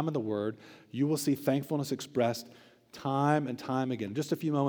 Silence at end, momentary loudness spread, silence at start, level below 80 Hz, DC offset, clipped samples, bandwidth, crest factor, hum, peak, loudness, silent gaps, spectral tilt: 0 s; 12 LU; 0 s; -80 dBFS; under 0.1%; under 0.1%; over 20 kHz; 20 dB; none; -12 dBFS; -32 LUFS; none; -6 dB/octave